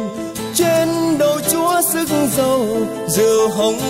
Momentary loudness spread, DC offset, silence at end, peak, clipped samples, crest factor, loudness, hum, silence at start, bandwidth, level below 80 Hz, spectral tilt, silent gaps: 6 LU; under 0.1%; 0 s; -2 dBFS; under 0.1%; 14 dB; -16 LUFS; none; 0 s; 16.5 kHz; -48 dBFS; -4 dB/octave; none